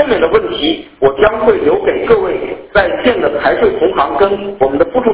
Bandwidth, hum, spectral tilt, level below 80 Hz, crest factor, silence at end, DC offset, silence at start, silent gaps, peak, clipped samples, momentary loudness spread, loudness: 4 kHz; none; -9 dB/octave; -36 dBFS; 12 dB; 0 s; under 0.1%; 0 s; none; 0 dBFS; under 0.1%; 4 LU; -12 LUFS